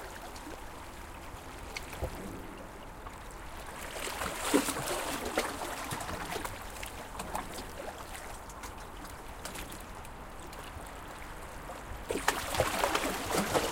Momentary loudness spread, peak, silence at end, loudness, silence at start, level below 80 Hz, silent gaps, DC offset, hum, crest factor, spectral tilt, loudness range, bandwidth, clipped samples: 16 LU; -10 dBFS; 0 s; -37 LUFS; 0 s; -48 dBFS; none; under 0.1%; none; 28 dB; -3 dB/octave; 10 LU; 17 kHz; under 0.1%